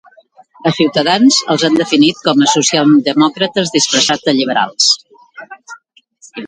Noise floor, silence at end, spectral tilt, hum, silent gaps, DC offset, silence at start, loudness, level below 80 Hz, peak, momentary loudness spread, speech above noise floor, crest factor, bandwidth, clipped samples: -47 dBFS; 0 s; -3 dB/octave; none; none; under 0.1%; 0.65 s; -12 LUFS; -58 dBFS; 0 dBFS; 6 LU; 35 dB; 14 dB; 9.6 kHz; under 0.1%